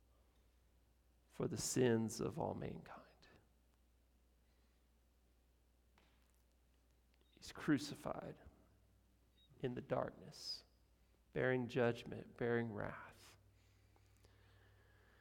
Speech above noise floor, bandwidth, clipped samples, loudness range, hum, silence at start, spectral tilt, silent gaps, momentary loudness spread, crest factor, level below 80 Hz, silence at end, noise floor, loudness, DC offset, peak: 33 dB; 17.5 kHz; under 0.1%; 6 LU; none; 1.35 s; -5 dB/octave; none; 18 LU; 22 dB; -72 dBFS; 1.85 s; -75 dBFS; -43 LUFS; under 0.1%; -24 dBFS